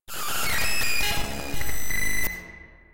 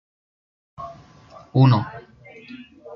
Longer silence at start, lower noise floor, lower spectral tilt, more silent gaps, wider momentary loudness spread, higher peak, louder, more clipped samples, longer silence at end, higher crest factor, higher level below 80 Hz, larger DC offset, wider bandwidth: second, 0 s vs 0.8 s; about the same, -46 dBFS vs -47 dBFS; second, -1.5 dB/octave vs -9.5 dB/octave; neither; second, 11 LU vs 25 LU; second, -12 dBFS vs -2 dBFS; second, -26 LUFS vs -18 LUFS; neither; about the same, 0 s vs 0 s; second, 10 dB vs 22 dB; first, -38 dBFS vs -60 dBFS; neither; first, 16.5 kHz vs 5.8 kHz